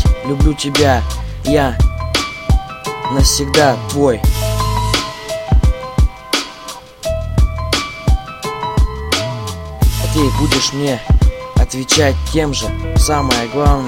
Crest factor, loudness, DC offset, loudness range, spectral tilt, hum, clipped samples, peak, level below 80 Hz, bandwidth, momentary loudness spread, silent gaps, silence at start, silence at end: 14 dB; -16 LUFS; under 0.1%; 4 LU; -4.5 dB/octave; none; under 0.1%; 0 dBFS; -18 dBFS; 16.5 kHz; 10 LU; none; 0 s; 0 s